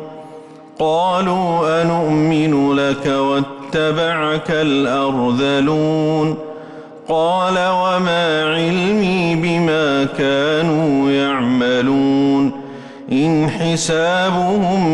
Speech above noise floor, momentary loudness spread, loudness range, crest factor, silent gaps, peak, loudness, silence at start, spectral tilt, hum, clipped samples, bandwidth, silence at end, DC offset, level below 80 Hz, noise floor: 22 dB; 6 LU; 1 LU; 8 dB; none; -8 dBFS; -16 LUFS; 0 s; -5.5 dB/octave; none; under 0.1%; 11.5 kHz; 0 s; under 0.1%; -50 dBFS; -37 dBFS